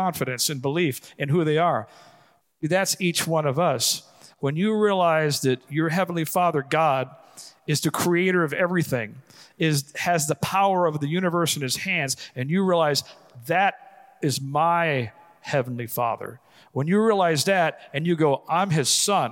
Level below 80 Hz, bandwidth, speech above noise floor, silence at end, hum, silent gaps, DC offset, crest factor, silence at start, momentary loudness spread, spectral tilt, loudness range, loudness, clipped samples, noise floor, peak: -68 dBFS; 17 kHz; 35 dB; 0 s; none; none; under 0.1%; 16 dB; 0 s; 9 LU; -4.5 dB/octave; 2 LU; -23 LUFS; under 0.1%; -58 dBFS; -6 dBFS